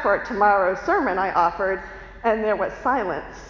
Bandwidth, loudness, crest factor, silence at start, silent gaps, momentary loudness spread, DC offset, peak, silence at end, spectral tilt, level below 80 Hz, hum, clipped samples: 7.2 kHz; -22 LUFS; 16 dB; 0 s; none; 8 LU; under 0.1%; -6 dBFS; 0 s; -6 dB/octave; -46 dBFS; none; under 0.1%